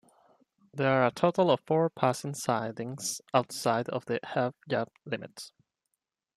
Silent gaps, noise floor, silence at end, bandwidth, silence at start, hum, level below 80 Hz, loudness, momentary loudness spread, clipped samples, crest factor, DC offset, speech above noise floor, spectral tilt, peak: none; -85 dBFS; 0.9 s; 14 kHz; 0.75 s; none; -74 dBFS; -29 LUFS; 12 LU; under 0.1%; 22 dB; under 0.1%; 55 dB; -5 dB/octave; -10 dBFS